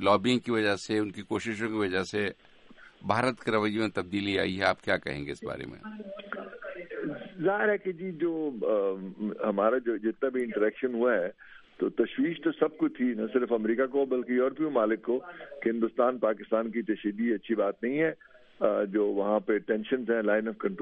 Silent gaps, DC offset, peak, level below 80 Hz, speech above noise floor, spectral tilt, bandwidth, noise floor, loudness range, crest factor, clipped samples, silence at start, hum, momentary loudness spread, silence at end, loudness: none; under 0.1%; -10 dBFS; -66 dBFS; 25 dB; -6 dB/octave; 11.5 kHz; -54 dBFS; 4 LU; 20 dB; under 0.1%; 0 s; none; 10 LU; 0 s; -29 LUFS